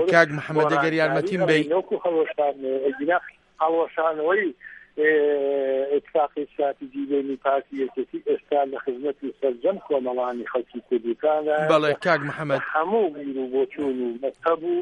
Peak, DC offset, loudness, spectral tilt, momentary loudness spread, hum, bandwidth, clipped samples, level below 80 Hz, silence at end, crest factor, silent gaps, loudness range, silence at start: -2 dBFS; under 0.1%; -24 LUFS; -6.5 dB/octave; 8 LU; none; 10.5 kHz; under 0.1%; -68 dBFS; 0 s; 20 dB; none; 3 LU; 0 s